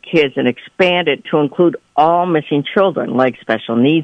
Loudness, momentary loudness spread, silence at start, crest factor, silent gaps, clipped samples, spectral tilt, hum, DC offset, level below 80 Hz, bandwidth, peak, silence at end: -15 LUFS; 4 LU; 0.05 s; 14 dB; none; under 0.1%; -7.5 dB/octave; none; under 0.1%; -60 dBFS; 8.2 kHz; 0 dBFS; 0 s